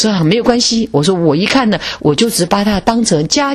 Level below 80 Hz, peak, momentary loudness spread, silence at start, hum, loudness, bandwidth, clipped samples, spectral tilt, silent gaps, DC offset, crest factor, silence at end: -38 dBFS; 0 dBFS; 2 LU; 0 s; none; -12 LUFS; 13.5 kHz; under 0.1%; -4.5 dB/octave; none; under 0.1%; 12 dB; 0 s